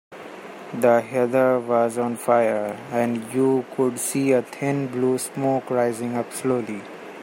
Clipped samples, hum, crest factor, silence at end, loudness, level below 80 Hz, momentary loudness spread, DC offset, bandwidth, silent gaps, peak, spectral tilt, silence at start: under 0.1%; none; 18 dB; 0 s; -22 LUFS; -70 dBFS; 14 LU; under 0.1%; 16.5 kHz; none; -4 dBFS; -5.5 dB/octave; 0.1 s